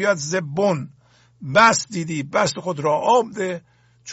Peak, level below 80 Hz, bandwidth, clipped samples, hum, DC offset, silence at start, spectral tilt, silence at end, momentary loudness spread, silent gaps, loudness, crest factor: -2 dBFS; -60 dBFS; 8.2 kHz; under 0.1%; none; under 0.1%; 0 s; -4 dB/octave; 0 s; 13 LU; none; -20 LUFS; 18 dB